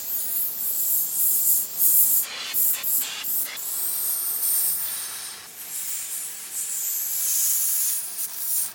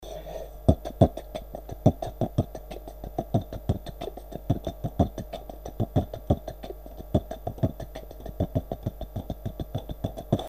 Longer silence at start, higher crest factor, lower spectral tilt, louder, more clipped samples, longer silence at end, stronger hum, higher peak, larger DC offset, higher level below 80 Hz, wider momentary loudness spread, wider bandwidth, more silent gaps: about the same, 0 s vs 0 s; second, 20 dB vs 26 dB; second, 2 dB/octave vs -8.5 dB/octave; first, -21 LUFS vs -30 LUFS; neither; about the same, 0 s vs 0 s; neither; about the same, -4 dBFS vs -2 dBFS; second, under 0.1% vs 0.2%; second, -74 dBFS vs -40 dBFS; second, 12 LU vs 15 LU; about the same, 17 kHz vs 15.5 kHz; neither